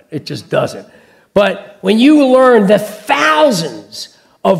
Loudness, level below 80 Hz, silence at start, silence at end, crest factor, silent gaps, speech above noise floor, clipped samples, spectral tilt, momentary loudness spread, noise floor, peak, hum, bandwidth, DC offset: -11 LUFS; -54 dBFS; 0.1 s; 0 s; 12 dB; none; 21 dB; 0.2%; -5 dB/octave; 19 LU; -32 dBFS; 0 dBFS; none; 15.5 kHz; under 0.1%